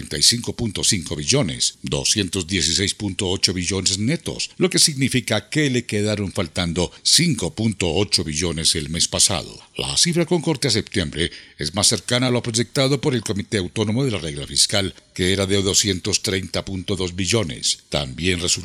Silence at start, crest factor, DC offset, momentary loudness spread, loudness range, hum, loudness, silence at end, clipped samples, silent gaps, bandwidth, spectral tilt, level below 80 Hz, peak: 0 s; 20 dB; under 0.1%; 9 LU; 2 LU; none; -20 LUFS; 0 s; under 0.1%; none; 16 kHz; -3 dB/octave; -46 dBFS; 0 dBFS